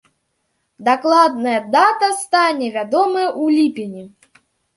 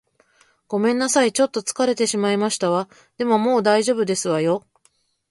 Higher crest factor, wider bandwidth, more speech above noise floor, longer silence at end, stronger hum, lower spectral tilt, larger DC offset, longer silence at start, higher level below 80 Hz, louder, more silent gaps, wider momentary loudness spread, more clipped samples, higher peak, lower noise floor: about the same, 16 dB vs 16 dB; about the same, 11.5 kHz vs 11.5 kHz; first, 53 dB vs 44 dB; about the same, 0.7 s vs 0.7 s; neither; about the same, -3.5 dB/octave vs -4 dB/octave; neither; about the same, 0.8 s vs 0.7 s; about the same, -70 dBFS vs -68 dBFS; first, -16 LUFS vs -20 LUFS; neither; about the same, 9 LU vs 7 LU; neither; about the same, -2 dBFS vs -4 dBFS; first, -69 dBFS vs -63 dBFS